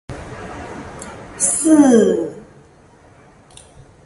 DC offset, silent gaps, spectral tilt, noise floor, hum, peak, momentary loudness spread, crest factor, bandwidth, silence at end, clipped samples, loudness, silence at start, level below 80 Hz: under 0.1%; none; -4.5 dB/octave; -47 dBFS; none; 0 dBFS; 22 LU; 18 dB; 11.5 kHz; 1.65 s; under 0.1%; -14 LUFS; 0.1 s; -46 dBFS